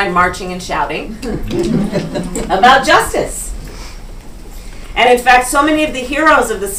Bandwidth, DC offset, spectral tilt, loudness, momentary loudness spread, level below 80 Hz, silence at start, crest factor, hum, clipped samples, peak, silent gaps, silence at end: 16.5 kHz; under 0.1%; -3.5 dB/octave; -13 LUFS; 18 LU; -30 dBFS; 0 s; 14 dB; none; 0.1%; 0 dBFS; none; 0 s